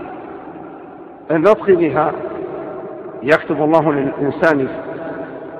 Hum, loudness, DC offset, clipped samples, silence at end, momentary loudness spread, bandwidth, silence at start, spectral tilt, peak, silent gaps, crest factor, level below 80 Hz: none; -17 LUFS; under 0.1%; under 0.1%; 0 s; 20 LU; 9.4 kHz; 0 s; -8 dB/octave; 0 dBFS; none; 18 dB; -54 dBFS